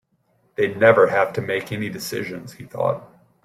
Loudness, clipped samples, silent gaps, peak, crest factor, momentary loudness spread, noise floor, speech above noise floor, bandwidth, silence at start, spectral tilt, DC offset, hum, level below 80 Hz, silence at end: -20 LUFS; under 0.1%; none; -2 dBFS; 20 dB; 18 LU; -65 dBFS; 44 dB; 15.5 kHz; 0.6 s; -5.5 dB/octave; under 0.1%; none; -62 dBFS; 0.4 s